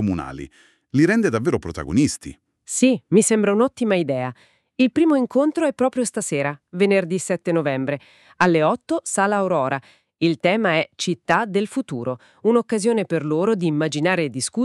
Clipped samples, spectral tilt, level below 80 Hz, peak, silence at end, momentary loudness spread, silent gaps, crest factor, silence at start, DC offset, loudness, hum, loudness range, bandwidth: under 0.1%; -5 dB/octave; -52 dBFS; -2 dBFS; 0 s; 10 LU; none; 18 dB; 0 s; under 0.1%; -20 LUFS; none; 2 LU; 13 kHz